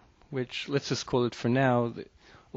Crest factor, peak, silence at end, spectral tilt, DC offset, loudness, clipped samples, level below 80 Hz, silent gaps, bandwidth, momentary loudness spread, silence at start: 18 dB; -12 dBFS; 0.5 s; -5 dB/octave; under 0.1%; -29 LUFS; under 0.1%; -62 dBFS; none; 7.8 kHz; 13 LU; 0.3 s